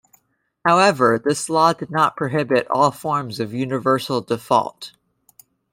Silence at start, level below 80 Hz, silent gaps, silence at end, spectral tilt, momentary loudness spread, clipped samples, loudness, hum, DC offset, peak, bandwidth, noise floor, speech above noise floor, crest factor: 0.65 s; -64 dBFS; none; 0.85 s; -5 dB/octave; 9 LU; under 0.1%; -19 LUFS; none; under 0.1%; -2 dBFS; 16.5 kHz; -67 dBFS; 48 dB; 18 dB